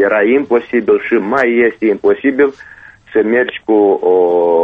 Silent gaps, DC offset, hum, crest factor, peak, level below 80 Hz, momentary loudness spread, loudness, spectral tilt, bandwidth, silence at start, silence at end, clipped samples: none; under 0.1%; none; 12 dB; 0 dBFS; -54 dBFS; 4 LU; -13 LUFS; -7.5 dB/octave; 5 kHz; 0 s; 0 s; under 0.1%